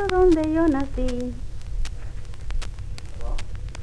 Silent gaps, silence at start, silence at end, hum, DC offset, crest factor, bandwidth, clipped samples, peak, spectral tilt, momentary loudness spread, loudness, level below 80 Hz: none; 0 s; 0 s; none; under 0.1%; 18 dB; 11 kHz; under 0.1%; -4 dBFS; -7 dB/octave; 19 LU; -25 LUFS; -30 dBFS